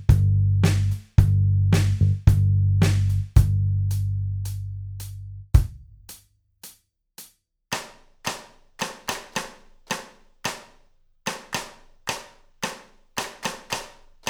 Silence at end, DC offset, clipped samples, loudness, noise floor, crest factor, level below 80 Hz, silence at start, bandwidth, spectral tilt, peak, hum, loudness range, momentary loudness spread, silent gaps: 0 s; under 0.1%; under 0.1%; -24 LUFS; -58 dBFS; 22 dB; -32 dBFS; 0 s; 15.5 kHz; -5.5 dB/octave; -2 dBFS; none; 13 LU; 23 LU; none